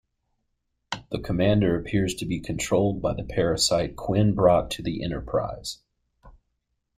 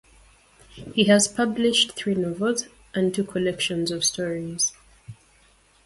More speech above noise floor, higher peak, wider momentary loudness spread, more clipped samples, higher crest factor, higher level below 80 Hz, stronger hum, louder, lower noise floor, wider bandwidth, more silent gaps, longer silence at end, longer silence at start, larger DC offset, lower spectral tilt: first, 53 dB vs 35 dB; about the same, -6 dBFS vs -6 dBFS; about the same, 12 LU vs 10 LU; neither; about the same, 20 dB vs 20 dB; first, -44 dBFS vs -58 dBFS; neither; about the same, -25 LUFS vs -23 LUFS; first, -77 dBFS vs -58 dBFS; first, 15.5 kHz vs 11.5 kHz; neither; about the same, 0.7 s vs 0.75 s; first, 0.9 s vs 0.75 s; neither; first, -5.5 dB/octave vs -3 dB/octave